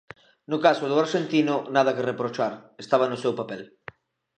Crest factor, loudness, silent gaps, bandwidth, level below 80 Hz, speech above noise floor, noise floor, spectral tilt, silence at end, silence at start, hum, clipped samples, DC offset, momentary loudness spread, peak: 20 dB; -24 LUFS; none; 9.2 kHz; -74 dBFS; 23 dB; -47 dBFS; -5.5 dB/octave; 0.7 s; 0.5 s; none; under 0.1%; under 0.1%; 17 LU; -4 dBFS